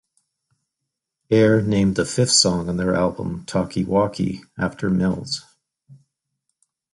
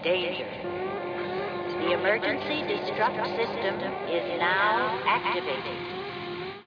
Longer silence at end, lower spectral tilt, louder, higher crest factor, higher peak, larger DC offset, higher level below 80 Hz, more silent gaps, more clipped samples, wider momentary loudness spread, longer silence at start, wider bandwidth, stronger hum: first, 1 s vs 0.05 s; second, -4.5 dB/octave vs -6.5 dB/octave; first, -20 LUFS vs -28 LUFS; about the same, 20 dB vs 18 dB; first, -2 dBFS vs -12 dBFS; neither; first, -46 dBFS vs -64 dBFS; neither; neither; about the same, 11 LU vs 9 LU; first, 1.3 s vs 0 s; first, 11.5 kHz vs 5.4 kHz; neither